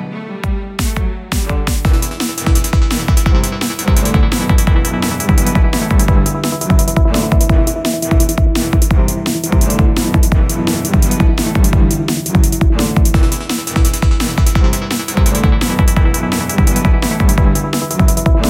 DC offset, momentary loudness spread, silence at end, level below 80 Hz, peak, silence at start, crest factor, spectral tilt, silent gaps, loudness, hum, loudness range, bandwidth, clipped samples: under 0.1%; 5 LU; 0 s; -14 dBFS; 0 dBFS; 0 s; 12 dB; -5.5 dB/octave; none; -14 LUFS; none; 1 LU; 16.5 kHz; under 0.1%